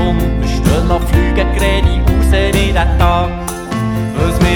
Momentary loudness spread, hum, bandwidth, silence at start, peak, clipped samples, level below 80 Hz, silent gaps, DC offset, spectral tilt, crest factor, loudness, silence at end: 5 LU; none; 18 kHz; 0 s; 0 dBFS; under 0.1%; -16 dBFS; none; under 0.1%; -6 dB/octave; 12 dB; -14 LUFS; 0 s